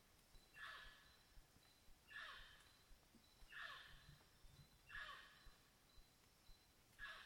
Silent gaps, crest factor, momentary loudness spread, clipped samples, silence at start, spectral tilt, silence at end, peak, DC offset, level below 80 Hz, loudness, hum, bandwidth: none; 20 dB; 13 LU; under 0.1%; 0 s; -2 dB/octave; 0 s; -42 dBFS; under 0.1%; -74 dBFS; -59 LUFS; none; 19 kHz